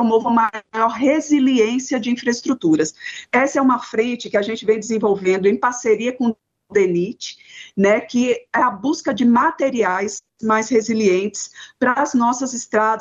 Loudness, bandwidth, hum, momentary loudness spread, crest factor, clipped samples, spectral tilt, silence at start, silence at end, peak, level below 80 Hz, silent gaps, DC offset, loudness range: -18 LUFS; 8 kHz; none; 7 LU; 14 dB; under 0.1%; -4.5 dB/octave; 0 s; 0 s; -4 dBFS; -62 dBFS; none; under 0.1%; 2 LU